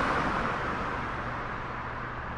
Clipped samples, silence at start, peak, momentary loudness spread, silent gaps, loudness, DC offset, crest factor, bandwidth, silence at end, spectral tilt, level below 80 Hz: under 0.1%; 0 s; -16 dBFS; 8 LU; none; -32 LUFS; under 0.1%; 16 dB; 11.5 kHz; 0 s; -6 dB/octave; -44 dBFS